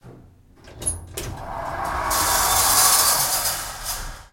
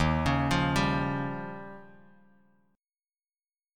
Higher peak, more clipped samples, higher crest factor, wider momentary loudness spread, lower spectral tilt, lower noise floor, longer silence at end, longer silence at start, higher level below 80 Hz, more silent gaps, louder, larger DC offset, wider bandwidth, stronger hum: first, -2 dBFS vs -12 dBFS; neither; about the same, 20 dB vs 18 dB; about the same, 17 LU vs 18 LU; second, -0.5 dB/octave vs -6 dB/octave; second, -49 dBFS vs under -90 dBFS; second, 0.05 s vs 1.9 s; about the same, 0.05 s vs 0 s; about the same, -40 dBFS vs -44 dBFS; neither; first, -19 LUFS vs -28 LUFS; neither; about the same, 16.5 kHz vs 15.5 kHz; neither